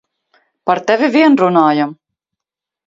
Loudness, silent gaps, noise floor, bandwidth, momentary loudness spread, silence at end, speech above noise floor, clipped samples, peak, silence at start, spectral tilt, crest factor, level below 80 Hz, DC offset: -13 LUFS; none; -85 dBFS; 7.6 kHz; 10 LU; 0.95 s; 73 dB; under 0.1%; 0 dBFS; 0.65 s; -6.5 dB/octave; 14 dB; -64 dBFS; under 0.1%